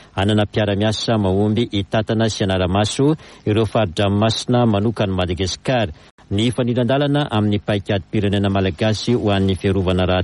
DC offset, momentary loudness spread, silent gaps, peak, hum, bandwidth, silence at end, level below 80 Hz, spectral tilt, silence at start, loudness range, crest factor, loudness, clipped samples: under 0.1%; 4 LU; 6.11-6.18 s; -4 dBFS; none; 11.5 kHz; 0 s; -42 dBFS; -6 dB/octave; 0.15 s; 1 LU; 12 dB; -19 LUFS; under 0.1%